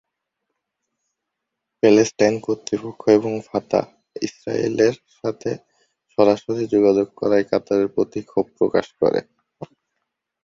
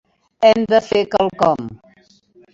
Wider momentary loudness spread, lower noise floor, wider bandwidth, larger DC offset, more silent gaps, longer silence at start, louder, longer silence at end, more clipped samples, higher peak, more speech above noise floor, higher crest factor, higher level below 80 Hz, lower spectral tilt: first, 13 LU vs 8 LU; first, -81 dBFS vs -53 dBFS; about the same, 7.8 kHz vs 7.6 kHz; neither; neither; first, 1.85 s vs 0.4 s; second, -20 LUFS vs -16 LUFS; about the same, 0.8 s vs 0.8 s; neither; about the same, -2 dBFS vs 0 dBFS; first, 62 dB vs 38 dB; about the same, 20 dB vs 18 dB; second, -60 dBFS vs -54 dBFS; about the same, -5.5 dB/octave vs -5.5 dB/octave